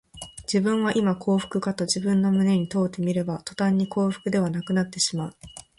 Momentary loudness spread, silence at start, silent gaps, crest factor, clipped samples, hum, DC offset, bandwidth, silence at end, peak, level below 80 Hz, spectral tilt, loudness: 8 LU; 0.15 s; none; 16 dB; under 0.1%; none; under 0.1%; 11.5 kHz; 0.2 s; -8 dBFS; -58 dBFS; -5.5 dB/octave; -24 LUFS